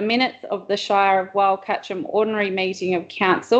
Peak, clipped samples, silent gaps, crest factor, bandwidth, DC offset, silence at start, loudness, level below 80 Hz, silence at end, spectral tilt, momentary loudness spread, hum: -4 dBFS; under 0.1%; none; 16 dB; 8.4 kHz; under 0.1%; 0 s; -21 LUFS; -68 dBFS; 0 s; -5 dB/octave; 7 LU; none